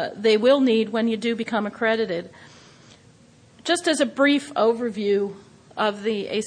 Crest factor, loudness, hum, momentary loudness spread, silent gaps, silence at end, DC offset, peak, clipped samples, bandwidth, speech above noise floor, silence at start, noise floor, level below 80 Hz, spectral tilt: 16 dB; -22 LUFS; none; 10 LU; none; 0 s; under 0.1%; -6 dBFS; under 0.1%; 10.5 kHz; 31 dB; 0 s; -53 dBFS; -70 dBFS; -4 dB/octave